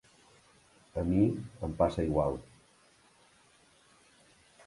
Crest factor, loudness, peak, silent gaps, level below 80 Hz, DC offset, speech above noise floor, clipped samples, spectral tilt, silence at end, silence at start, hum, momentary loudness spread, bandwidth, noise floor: 22 dB; -32 LUFS; -12 dBFS; none; -50 dBFS; under 0.1%; 34 dB; under 0.1%; -8.5 dB/octave; 2.25 s; 0.95 s; none; 12 LU; 11.5 kHz; -64 dBFS